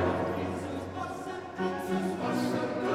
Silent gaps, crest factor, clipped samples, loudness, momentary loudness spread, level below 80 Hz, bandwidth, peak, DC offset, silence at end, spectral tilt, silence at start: none; 14 dB; under 0.1%; -33 LUFS; 7 LU; -62 dBFS; 16 kHz; -16 dBFS; under 0.1%; 0 s; -6.5 dB/octave; 0 s